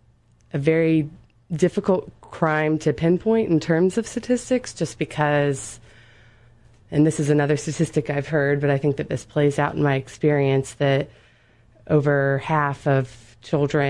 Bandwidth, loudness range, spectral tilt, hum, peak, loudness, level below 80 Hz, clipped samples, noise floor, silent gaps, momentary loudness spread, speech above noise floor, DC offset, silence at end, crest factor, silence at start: 11.5 kHz; 2 LU; -6.5 dB/octave; none; -6 dBFS; -22 LUFS; -54 dBFS; under 0.1%; -57 dBFS; none; 7 LU; 36 dB; under 0.1%; 0 s; 16 dB; 0.55 s